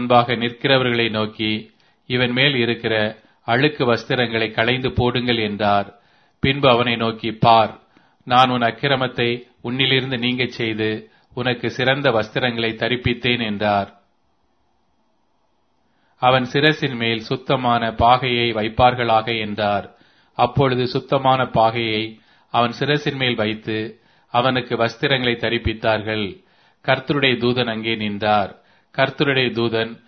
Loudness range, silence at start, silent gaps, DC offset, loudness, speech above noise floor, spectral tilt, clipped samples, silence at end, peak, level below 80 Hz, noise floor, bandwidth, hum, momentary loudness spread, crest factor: 3 LU; 0 s; none; under 0.1%; -19 LUFS; 48 dB; -6.5 dB/octave; under 0.1%; 0.1 s; 0 dBFS; -46 dBFS; -66 dBFS; 6.6 kHz; none; 8 LU; 20 dB